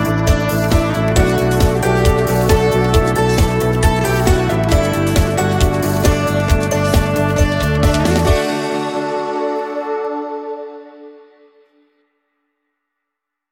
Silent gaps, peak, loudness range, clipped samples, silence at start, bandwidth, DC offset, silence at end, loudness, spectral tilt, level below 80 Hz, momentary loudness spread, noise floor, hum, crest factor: none; 0 dBFS; 11 LU; under 0.1%; 0 s; 17 kHz; under 0.1%; 2.4 s; -15 LUFS; -6 dB/octave; -22 dBFS; 7 LU; -79 dBFS; none; 14 dB